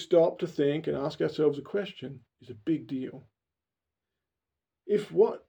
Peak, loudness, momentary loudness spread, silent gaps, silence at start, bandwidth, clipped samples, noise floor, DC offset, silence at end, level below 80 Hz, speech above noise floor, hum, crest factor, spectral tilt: -12 dBFS; -29 LUFS; 19 LU; none; 0 s; 9.2 kHz; under 0.1%; -90 dBFS; under 0.1%; 0.1 s; -72 dBFS; 62 dB; none; 18 dB; -7 dB/octave